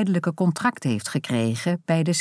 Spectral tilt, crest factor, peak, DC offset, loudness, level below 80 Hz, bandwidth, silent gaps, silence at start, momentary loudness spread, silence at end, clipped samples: -5.5 dB/octave; 16 dB; -8 dBFS; under 0.1%; -24 LUFS; -68 dBFS; 11 kHz; none; 0 s; 4 LU; 0 s; under 0.1%